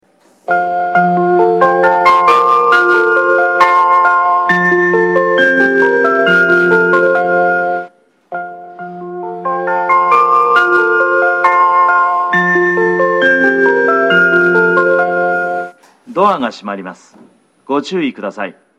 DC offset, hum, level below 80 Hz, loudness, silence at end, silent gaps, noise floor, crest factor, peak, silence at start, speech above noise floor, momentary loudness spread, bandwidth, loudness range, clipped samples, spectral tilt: under 0.1%; none; -60 dBFS; -11 LUFS; 0.3 s; none; -46 dBFS; 12 dB; 0 dBFS; 0.5 s; 26 dB; 14 LU; 10.5 kHz; 6 LU; under 0.1%; -6 dB/octave